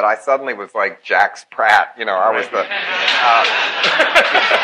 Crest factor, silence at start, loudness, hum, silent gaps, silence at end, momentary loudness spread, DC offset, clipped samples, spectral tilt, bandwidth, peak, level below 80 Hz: 16 dB; 0 s; -15 LUFS; none; none; 0 s; 8 LU; under 0.1%; under 0.1%; -1 dB/octave; 13.5 kHz; 0 dBFS; -62 dBFS